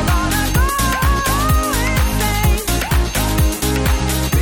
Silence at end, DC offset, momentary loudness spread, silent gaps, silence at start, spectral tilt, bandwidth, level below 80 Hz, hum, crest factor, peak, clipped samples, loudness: 0 s; under 0.1%; 2 LU; none; 0 s; -4 dB/octave; 18 kHz; -20 dBFS; none; 12 dB; -4 dBFS; under 0.1%; -17 LUFS